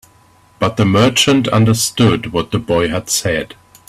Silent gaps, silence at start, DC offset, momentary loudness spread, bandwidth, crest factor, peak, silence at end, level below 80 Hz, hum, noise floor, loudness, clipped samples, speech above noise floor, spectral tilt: none; 0.6 s; under 0.1%; 8 LU; 16 kHz; 14 dB; 0 dBFS; 0.35 s; -44 dBFS; none; -49 dBFS; -14 LUFS; under 0.1%; 35 dB; -4.5 dB/octave